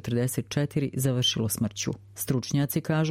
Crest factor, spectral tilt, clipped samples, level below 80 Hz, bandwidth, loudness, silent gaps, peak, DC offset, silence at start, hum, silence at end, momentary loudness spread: 16 dB; -5 dB/octave; under 0.1%; -56 dBFS; 16 kHz; -27 LUFS; none; -12 dBFS; under 0.1%; 0.05 s; none; 0 s; 6 LU